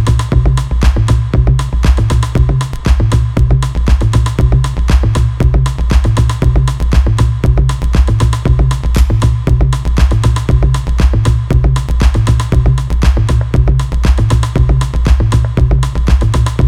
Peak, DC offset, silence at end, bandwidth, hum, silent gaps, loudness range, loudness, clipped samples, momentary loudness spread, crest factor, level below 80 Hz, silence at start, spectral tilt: 0 dBFS; under 0.1%; 0 s; 11 kHz; none; none; 0 LU; -12 LUFS; under 0.1%; 2 LU; 10 dB; -12 dBFS; 0 s; -6.5 dB/octave